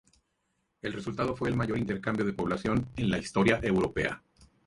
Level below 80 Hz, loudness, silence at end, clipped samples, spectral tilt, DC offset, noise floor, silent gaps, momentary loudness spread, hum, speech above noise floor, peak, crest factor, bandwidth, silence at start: -50 dBFS; -30 LUFS; 0.2 s; under 0.1%; -6.5 dB/octave; under 0.1%; -77 dBFS; none; 10 LU; none; 48 dB; -12 dBFS; 20 dB; 11.5 kHz; 0.85 s